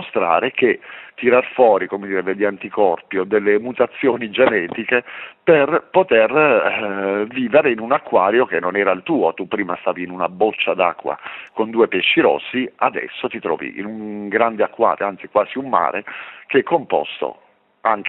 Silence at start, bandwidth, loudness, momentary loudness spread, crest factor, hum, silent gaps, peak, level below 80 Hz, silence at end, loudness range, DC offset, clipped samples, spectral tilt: 0 s; 4.1 kHz; -18 LUFS; 11 LU; 18 dB; none; none; 0 dBFS; -66 dBFS; 0 s; 4 LU; under 0.1%; under 0.1%; -9 dB/octave